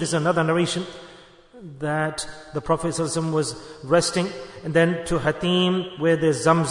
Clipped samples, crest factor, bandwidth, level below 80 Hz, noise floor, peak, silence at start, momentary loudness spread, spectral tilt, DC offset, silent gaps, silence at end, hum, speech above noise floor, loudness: under 0.1%; 18 dB; 11 kHz; -50 dBFS; -48 dBFS; -4 dBFS; 0 s; 12 LU; -5 dB/octave; under 0.1%; none; 0 s; none; 25 dB; -23 LUFS